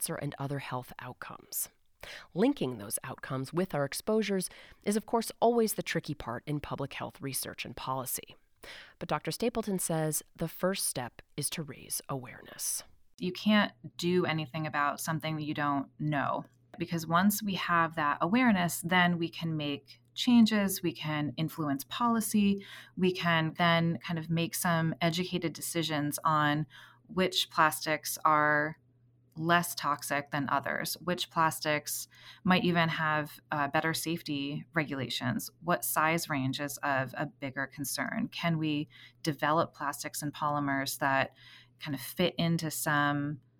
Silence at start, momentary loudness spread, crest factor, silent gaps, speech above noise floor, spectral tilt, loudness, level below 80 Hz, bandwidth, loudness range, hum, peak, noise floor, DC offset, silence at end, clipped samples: 0 s; 11 LU; 20 dB; none; 34 dB; -4.5 dB/octave; -31 LUFS; -64 dBFS; over 20 kHz; 5 LU; none; -10 dBFS; -66 dBFS; under 0.1%; 0.2 s; under 0.1%